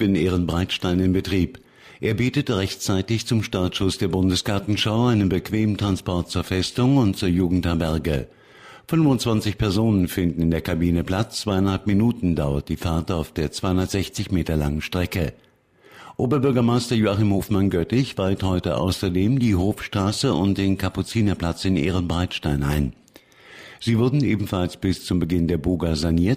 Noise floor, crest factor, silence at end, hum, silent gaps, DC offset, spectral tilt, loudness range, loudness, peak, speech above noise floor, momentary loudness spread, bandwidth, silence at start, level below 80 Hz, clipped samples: -53 dBFS; 14 dB; 0 s; none; none; under 0.1%; -6 dB/octave; 3 LU; -22 LUFS; -8 dBFS; 32 dB; 6 LU; 15.5 kHz; 0 s; -38 dBFS; under 0.1%